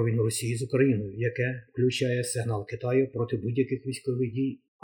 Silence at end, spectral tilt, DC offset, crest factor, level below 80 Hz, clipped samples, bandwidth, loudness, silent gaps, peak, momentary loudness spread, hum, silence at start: 0.3 s; -6 dB/octave; under 0.1%; 18 dB; -62 dBFS; under 0.1%; 19 kHz; -28 LUFS; none; -10 dBFS; 7 LU; none; 0 s